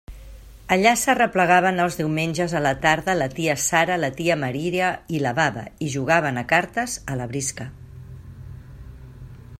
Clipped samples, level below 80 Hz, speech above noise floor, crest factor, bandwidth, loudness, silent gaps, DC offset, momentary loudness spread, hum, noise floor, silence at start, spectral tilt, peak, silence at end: under 0.1%; -46 dBFS; 20 dB; 20 dB; 16 kHz; -21 LUFS; none; under 0.1%; 23 LU; none; -42 dBFS; 0.1 s; -4 dB/octave; -2 dBFS; 0.05 s